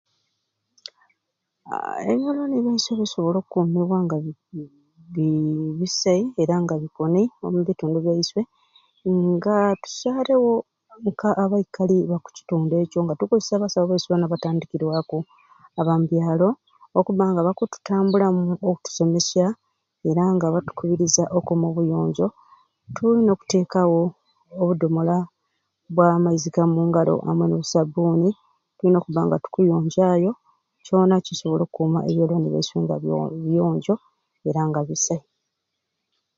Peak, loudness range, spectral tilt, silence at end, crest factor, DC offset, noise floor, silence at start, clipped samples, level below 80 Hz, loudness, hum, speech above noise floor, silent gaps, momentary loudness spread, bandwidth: -4 dBFS; 3 LU; -6 dB/octave; 1.2 s; 18 dB; under 0.1%; -79 dBFS; 1.65 s; under 0.1%; -62 dBFS; -22 LUFS; none; 58 dB; none; 9 LU; 7.6 kHz